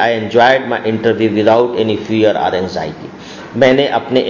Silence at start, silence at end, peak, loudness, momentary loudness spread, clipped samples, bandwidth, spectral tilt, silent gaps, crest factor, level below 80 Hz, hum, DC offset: 0 s; 0 s; 0 dBFS; -13 LUFS; 15 LU; under 0.1%; 7.4 kHz; -6 dB/octave; none; 14 dB; -48 dBFS; none; under 0.1%